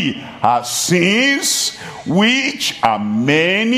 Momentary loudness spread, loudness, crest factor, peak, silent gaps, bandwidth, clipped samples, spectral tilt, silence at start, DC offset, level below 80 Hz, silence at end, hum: 7 LU; -15 LUFS; 16 dB; 0 dBFS; none; 15.5 kHz; under 0.1%; -3 dB/octave; 0 s; under 0.1%; -58 dBFS; 0 s; none